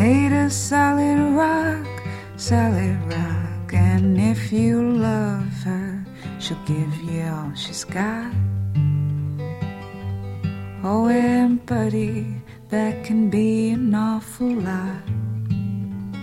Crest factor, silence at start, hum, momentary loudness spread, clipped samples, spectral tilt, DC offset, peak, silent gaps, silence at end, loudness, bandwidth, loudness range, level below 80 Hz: 16 dB; 0 s; none; 12 LU; under 0.1%; -6.5 dB/octave; under 0.1%; -6 dBFS; none; 0 s; -22 LUFS; 14.5 kHz; 5 LU; -48 dBFS